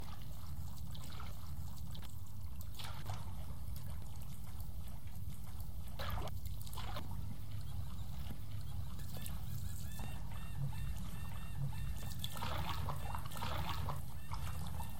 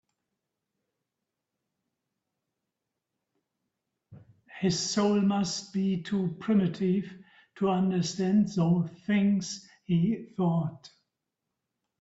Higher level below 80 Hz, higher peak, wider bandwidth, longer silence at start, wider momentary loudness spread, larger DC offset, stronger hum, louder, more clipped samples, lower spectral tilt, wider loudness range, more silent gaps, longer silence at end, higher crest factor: first, -50 dBFS vs -68 dBFS; second, -24 dBFS vs -14 dBFS; first, 17 kHz vs 8 kHz; second, 0 s vs 4.1 s; about the same, 7 LU vs 6 LU; first, 1% vs under 0.1%; neither; second, -46 LUFS vs -28 LUFS; neither; about the same, -5 dB/octave vs -6 dB/octave; about the same, 5 LU vs 4 LU; neither; second, 0 s vs 1.15 s; about the same, 20 dB vs 18 dB